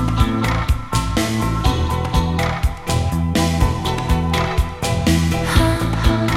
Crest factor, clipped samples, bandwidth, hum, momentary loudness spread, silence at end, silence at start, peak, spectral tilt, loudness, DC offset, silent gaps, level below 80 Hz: 16 dB; under 0.1%; 16 kHz; none; 4 LU; 0 s; 0 s; 0 dBFS; -5.5 dB/octave; -19 LUFS; under 0.1%; none; -22 dBFS